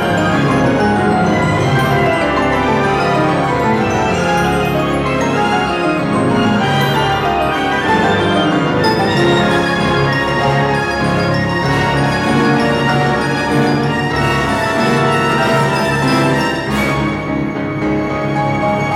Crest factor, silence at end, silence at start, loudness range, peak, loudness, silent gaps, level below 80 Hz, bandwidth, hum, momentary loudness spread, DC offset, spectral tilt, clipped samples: 12 dB; 0 s; 0 s; 1 LU; -2 dBFS; -14 LUFS; none; -36 dBFS; 15.5 kHz; none; 3 LU; under 0.1%; -6 dB/octave; under 0.1%